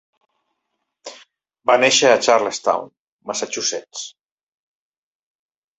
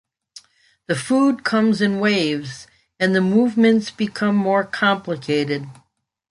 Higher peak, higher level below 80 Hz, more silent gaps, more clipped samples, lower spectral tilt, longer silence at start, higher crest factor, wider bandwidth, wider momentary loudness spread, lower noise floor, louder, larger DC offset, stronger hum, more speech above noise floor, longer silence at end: about the same, -2 dBFS vs -4 dBFS; second, -70 dBFS vs -62 dBFS; first, 2.99-3.19 s vs none; neither; second, -1 dB/octave vs -5.5 dB/octave; first, 1.05 s vs 0.35 s; about the same, 20 dB vs 16 dB; second, 8.4 kHz vs 11.5 kHz; first, 25 LU vs 10 LU; first, -76 dBFS vs -47 dBFS; about the same, -17 LUFS vs -19 LUFS; neither; neither; first, 59 dB vs 29 dB; first, 1.7 s vs 0.6 s